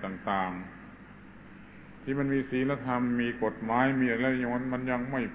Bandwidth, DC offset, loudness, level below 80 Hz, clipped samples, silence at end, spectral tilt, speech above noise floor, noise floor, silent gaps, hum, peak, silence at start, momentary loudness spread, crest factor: 4 kHz; under 0.1%; -30 LUFS; -58 dBFS; under 0.1%; 0 s; -5.5 dB/octave; 20 dB; -50 dBFS; none; none; -10 dBFS; 0 s; 23 LU; 20 dB